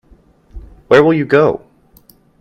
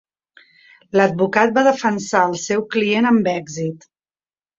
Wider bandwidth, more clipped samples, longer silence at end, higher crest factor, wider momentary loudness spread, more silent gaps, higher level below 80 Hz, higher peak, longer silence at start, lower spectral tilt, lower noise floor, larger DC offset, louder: first, 13.5 kHz vs 7.8 kHz; neither; about the same, 0.85 s vs 0.8 s; about the same, 16 dB vs 18 dB; about the same, 7 LU vs 9 LU; neither; first, -42 dBFS vs -62 dBFS; about the same, 0 dBFS vs -2 dBFS; second, 0.55 s vs 0.95 s; first, -7.5 dB/octave vs -5 dB/octave; second, -48 dBFS vs under -90 dBFS; neither; first, -12 LUFS vs -18 LUFS